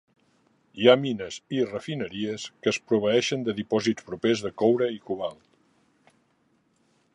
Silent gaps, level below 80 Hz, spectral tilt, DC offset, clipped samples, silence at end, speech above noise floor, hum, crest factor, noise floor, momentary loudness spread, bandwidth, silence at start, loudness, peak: none; -66 dBFS; -5 dB/octave; under 0.1%; under 0.1%; 1.8 s; 43 dB; none; 24 dB; -68 dBFS; 12 LU; 11 kHz; 0.75 s; -26 LUFS; -4 dBFS